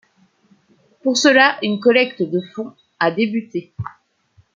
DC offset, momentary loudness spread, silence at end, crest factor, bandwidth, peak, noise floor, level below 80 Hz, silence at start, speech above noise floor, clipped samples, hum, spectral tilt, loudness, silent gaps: under 0.1%; 19 LU; 0.65 s; 18 dB; 9.2 kHz; 0 dBFS; -57 dBFS; -62 dBFS; 1.05 s; 40 dB; under 0.1%; none; -4 dB/octave; -17 LUFS; none